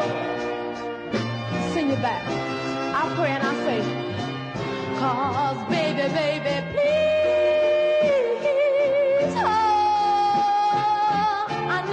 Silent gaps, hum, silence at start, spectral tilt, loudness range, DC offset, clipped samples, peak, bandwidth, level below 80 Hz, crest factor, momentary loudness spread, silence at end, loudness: none; none; 0 s; -6 dB/octave; 5 LU; under 0.1%; under 0.1%; -12 dBFS; 9.8 kHz; -56 dBFS; 10 dB; 8 LU; 0 s; -23 LUFS